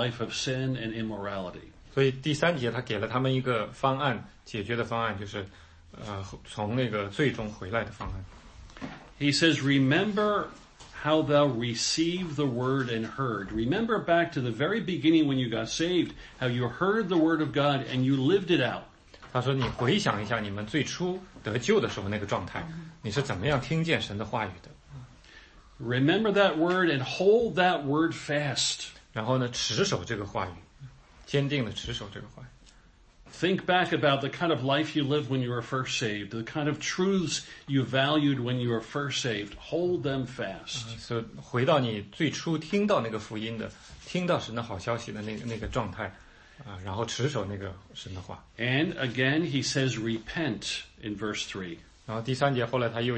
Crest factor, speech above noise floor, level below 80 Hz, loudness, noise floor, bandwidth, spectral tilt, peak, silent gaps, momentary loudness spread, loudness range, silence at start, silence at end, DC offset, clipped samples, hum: 20 dB; 29 dB; -54 dBFS; -28 LUFS; -57 dBFS; 8.8 kHz; -5 dB/octave; -8 dBFS; none; 14 LU; 7 LU; 0 s; 0 s; under 0.1%; under 0.1%; none